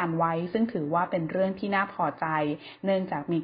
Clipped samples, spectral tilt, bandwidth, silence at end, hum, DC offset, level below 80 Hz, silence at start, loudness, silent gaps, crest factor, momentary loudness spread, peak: under 0.1%; -11 dB/octave; 5.2 kHz; 0 s; none; under 0.1%; -66 dBFS; 0 s; -28 LUFS; none; 14 dB; 3 LU; -12 dBFS